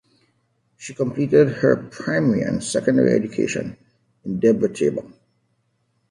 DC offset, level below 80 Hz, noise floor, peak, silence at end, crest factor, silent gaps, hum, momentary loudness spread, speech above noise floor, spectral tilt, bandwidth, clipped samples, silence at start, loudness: under 0.1%; -58 dBFS; -68 dBFS; -4 dBFS; 1.05 s; 18 dB; none; none; 15 LU; 49 dB; -6.5 dB/octave; 11.5 kHz; under 0.1%; 0.8 s; -20 LUFS